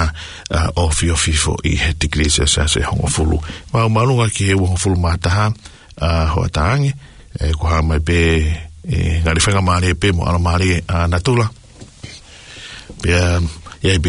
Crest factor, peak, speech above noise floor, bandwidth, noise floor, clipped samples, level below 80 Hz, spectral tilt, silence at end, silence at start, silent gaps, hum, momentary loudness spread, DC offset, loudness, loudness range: 16 dB; 0 dBFS; 22 dB; 11 kHz; -37 dBFS; under 0.1%; -26 dBFS; -4.5 dB/octave; 0 s; 0 s; none; none; 14 LU; under 0.1%; -16 LUFS; 3 LU